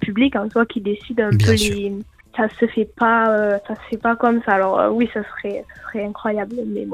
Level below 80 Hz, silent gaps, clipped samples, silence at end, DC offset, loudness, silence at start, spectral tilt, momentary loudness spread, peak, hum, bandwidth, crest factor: -46 dBFS; none; under 0.1%; 0 s; under 0.1%; -19 LUFS; 0 s; -6 dB/octave; 12 LU; -2 dBFS; none; 15 kHz; 18 dB